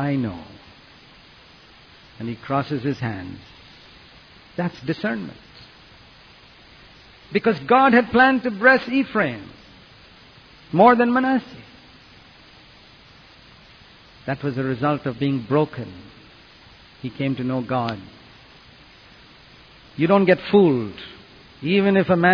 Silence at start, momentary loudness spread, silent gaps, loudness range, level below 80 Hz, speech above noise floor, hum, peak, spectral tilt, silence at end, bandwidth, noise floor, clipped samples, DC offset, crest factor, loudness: 0 s; 21 LU; none; 12 LU; -56 dBFS; 29 dB; none; -2 dBFS; -8.5 dB/octave; 0 s; 5.4 kHz; -48 dBFS; under 0.1%; under 0.1%; 20 dB; -20 LUFS